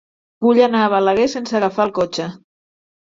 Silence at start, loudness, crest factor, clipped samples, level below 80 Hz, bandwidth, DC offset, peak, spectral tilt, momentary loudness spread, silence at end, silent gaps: 0.4 s; -17 LUFS; 16 dB; under 0.1%; -58 dBFS; 7.6 kHz; under 0.1%; -2 dBFS; -5.5 dB/octave; 8 LU; 0.8 s; none